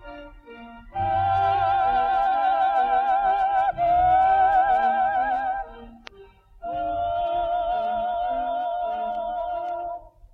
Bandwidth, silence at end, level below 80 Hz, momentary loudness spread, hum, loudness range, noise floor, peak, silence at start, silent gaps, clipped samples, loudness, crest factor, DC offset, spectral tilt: 5 kHz; 0.25 s; -46 dBFS; 16 LU; none; 7 LU; -50 dBFS; -10 dBFS; 0 s; none; under 0.1%; -23 LUFS; 14 dB; under 0.1%; -6.5 dB/octave